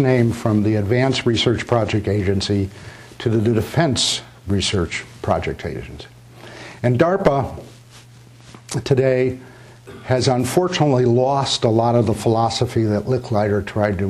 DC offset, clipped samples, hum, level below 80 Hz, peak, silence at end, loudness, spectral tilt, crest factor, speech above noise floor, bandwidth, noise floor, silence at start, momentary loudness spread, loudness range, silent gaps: under 0.1%; under 0.1%; none; -44 dBFS; -4 dBFS; 0 s; -19 LUFS; -5.5 dB/octave; 16 dB; 26 dB; 14 kHz; -44 dBFS; 0 s; 13 LU; 5 LU; none